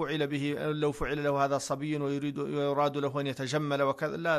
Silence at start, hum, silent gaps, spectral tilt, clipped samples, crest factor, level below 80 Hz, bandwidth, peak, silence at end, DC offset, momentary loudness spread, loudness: 0 s; none; none; -5.5 dB/octave; under 0.1%; 16 dB; -54 dBFS; 13 kHz; -14 dBFS; 0 s; under 0.1%; 4 LU; -31 LUFS